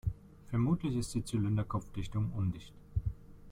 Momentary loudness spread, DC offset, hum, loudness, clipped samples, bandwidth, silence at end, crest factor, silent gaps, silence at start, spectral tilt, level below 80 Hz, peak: 11 LU; under 0.1%; none; -36 LUFS; under 0.1%; 14.5 kHz; 0 s; 16 dB; none; 0.05 s; -7 dB/octave; -48 dBFS; -20 dBFS